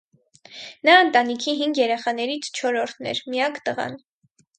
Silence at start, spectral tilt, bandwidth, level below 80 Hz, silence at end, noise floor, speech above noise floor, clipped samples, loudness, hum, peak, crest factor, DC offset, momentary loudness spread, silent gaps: 0.5 s; -2.5 dB/octave; 9.4 kHz; -74 dBFS; 0.6 s; -64 dBFS; 42 dB; under 0.1%; -21 LUFS; none; 0 dBFS; 22 dB; under 0.1%; 14 LU; none